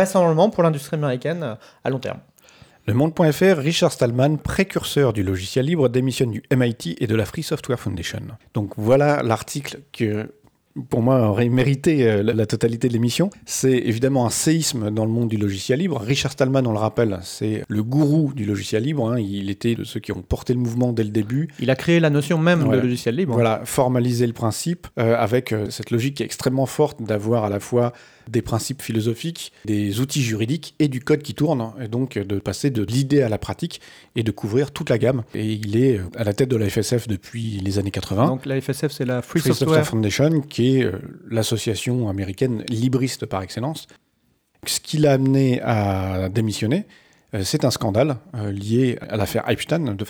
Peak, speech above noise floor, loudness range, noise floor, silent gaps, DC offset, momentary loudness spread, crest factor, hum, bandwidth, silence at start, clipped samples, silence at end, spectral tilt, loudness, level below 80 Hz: -2 dBFS; 45 dB; 4 LU; -66 dBFS; none; under 0.1%; 9 LU; 18 dB; none; over 20 kHz; 0 s; under 0.1%; 0 s; -6 dB/octave; -21 LUFS; -50 dBFS